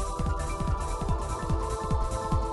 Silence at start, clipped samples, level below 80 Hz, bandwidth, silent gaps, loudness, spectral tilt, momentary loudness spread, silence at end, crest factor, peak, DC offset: 0 s; under 0.1%; -32 dBFS; 12 kHz; none; -31 LUFS; -6 dB/octave; 2 LU; 0 s; 14 dB; -14 dBFS; under 0.1%